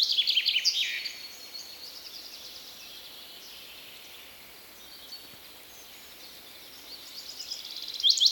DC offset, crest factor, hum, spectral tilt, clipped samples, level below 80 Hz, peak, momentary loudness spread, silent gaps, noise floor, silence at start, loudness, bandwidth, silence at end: under 0.1%; 24 dB; none; 2.5 dB/octave; under 0.1%; -72 dBFS; -10 dBFS; 22 LU; none; -49 dBFS; 0 s; -28 LUFS; 18.5 kHz; 0 s